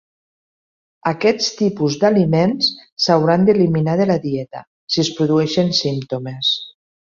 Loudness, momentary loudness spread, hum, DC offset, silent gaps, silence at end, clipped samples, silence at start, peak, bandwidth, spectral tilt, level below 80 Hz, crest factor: -17 LUFS; 10 LU; none; under 0.1%; 2.92-2.96 s, 4.67-4.87 s; 0.3 s; under 0.1%; 1.05 s; -2 dBFS; 7.4 kHz; -5.5 dB/octave; -56 dBFS; 16 dB